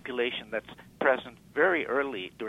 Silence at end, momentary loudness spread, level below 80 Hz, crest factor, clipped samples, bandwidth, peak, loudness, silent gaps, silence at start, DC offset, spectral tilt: 0 s; 11 LU; -66 dBFS; 20 dB; under 0.1%; 13.5 kHz; -10 dBFS; -29 LUFS; none; 0.05 s; under 0.1%; -5.5 dB/octave